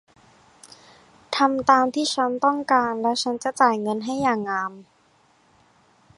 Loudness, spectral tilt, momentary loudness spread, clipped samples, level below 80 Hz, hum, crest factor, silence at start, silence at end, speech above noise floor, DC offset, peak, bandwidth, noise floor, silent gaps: -22 LUFS; -3.5 dB/octave; 8 LU; under 0.1%; -66 dBFS; none; 22 dB; 0.65 s; 1.35 s; 39 dB; under 0.1%; -2 dBFS; 11.5 kHz; -60 dBFS; none